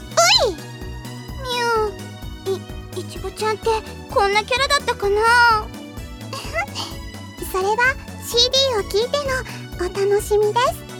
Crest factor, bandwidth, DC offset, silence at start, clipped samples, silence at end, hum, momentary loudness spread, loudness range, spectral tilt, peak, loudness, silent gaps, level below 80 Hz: 18 dB; 19.5 kHz; under 0.1%; 0 s; under 0.1%; 0 s; none; 19 LU; 6 LU; -2.5 dB/octave; -2 dBFS; -19 LUFS; none; -38 dBFS